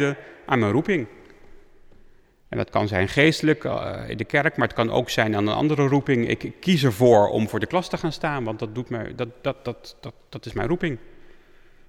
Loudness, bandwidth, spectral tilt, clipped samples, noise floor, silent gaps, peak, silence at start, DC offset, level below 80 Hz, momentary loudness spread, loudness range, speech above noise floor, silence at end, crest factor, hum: -23 LUFS; 16.5 kHz; -6 dB/octave; under 0.1%; -52 dBFS; none; -6 dBFS; 0 s; under 0.1%; -48 dBFS; 15 LU; 8 LU; 29 dB; 0.55 s; 18 dB; none